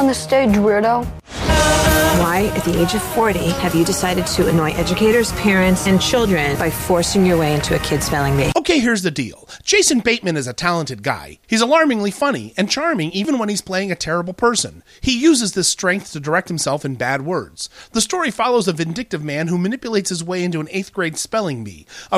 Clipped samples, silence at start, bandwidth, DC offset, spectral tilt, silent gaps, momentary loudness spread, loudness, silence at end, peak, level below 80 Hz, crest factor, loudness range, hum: under 0.1%; 0 s; 15.5 kHz; under 0.1%; -4 dB/octave; none; 9 LU; -17 LUFS; 0 s; -2 dBFS; -34 dBFS; 14 dB; 4 LU; none